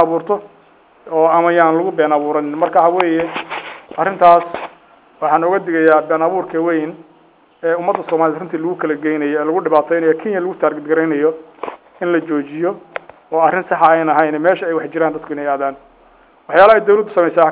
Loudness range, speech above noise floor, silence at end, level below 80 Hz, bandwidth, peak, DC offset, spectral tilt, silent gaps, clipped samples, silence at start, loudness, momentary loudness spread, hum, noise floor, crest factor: 3 LU; 35 dB; 0 s; -60 dBFS; 4 kHz; 0 dBFS; under 0.1%; -9.5 dB/octave; none; 0.2%; 0 s; -15 LUFS; 12 LU; none; -50 dBFS; 16 dB